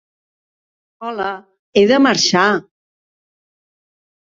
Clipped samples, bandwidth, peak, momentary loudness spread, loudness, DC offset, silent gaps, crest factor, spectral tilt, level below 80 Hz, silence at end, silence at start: under 0.1%; 7.8 kHz; -2 dBFS; 16 LU; -15 LUFS; under 0.1%; 1.59-1.73 s; 18 dB; -3.5 dB/octave; -62 dBFS; 1.65 s; 1 s